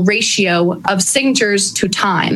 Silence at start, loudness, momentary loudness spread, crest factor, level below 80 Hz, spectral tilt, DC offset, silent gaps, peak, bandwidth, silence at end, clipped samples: 0 s; -13 LUFS; 3 LU; 14 dB; -52 dBFS; -3 dB/octave; under 0.1%; none; 0 dBFS; 14.5 kHz; 0 s; under 0.1%